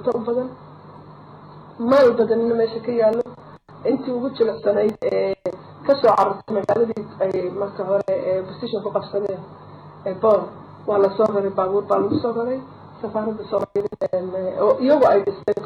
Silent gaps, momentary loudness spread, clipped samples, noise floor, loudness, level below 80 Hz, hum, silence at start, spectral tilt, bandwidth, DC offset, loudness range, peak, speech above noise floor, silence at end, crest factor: none; 12 LU; under 0.1%; -43 dBFS; -21 LUFS; -60 dBFS; 50 Hz at -50 dBFS; 0 s; -7.5 dB/octave; 8.4 kHz; under 0.1%; 3 LU; -6 dBFS; 23 dB; 0 s; 14 dB